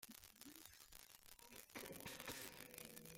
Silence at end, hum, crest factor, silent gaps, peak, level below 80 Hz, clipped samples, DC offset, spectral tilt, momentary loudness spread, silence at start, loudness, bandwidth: 0 s; none; 30 dB; none; -28 dBFS; -76 dBFS; under 0.1%; under 0.1%; -2 dB/octave; 10 LU; 0 s; -56 LUFS; 16.5 kHz